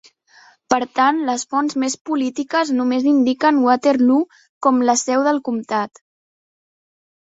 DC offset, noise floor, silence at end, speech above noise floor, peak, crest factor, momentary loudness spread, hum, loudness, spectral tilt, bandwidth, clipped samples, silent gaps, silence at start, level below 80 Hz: under 0.1%; -51 dBFS; 1.55 s; 34 dB; 0 dBFS; 18 dB; 7 LU; none; -18 LUFS; -3 dB/octave; 8 kHz; under 0.1%; 2.01-2.05 s, 4.49-4.61 s; 0.7 s; -66 dBFS